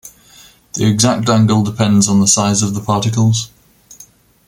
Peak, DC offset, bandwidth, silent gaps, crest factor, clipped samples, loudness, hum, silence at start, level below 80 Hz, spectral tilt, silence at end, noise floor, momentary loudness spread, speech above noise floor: 0 dBFS; under 0.1%; 16 kHz; none; 14 dB; under 0.1%; -13 LUFS; none; 0.05 s; -48 dBFS; -4.5 dB/octave; 0.45 s; -44 dBFS; 7 LU; 31 dB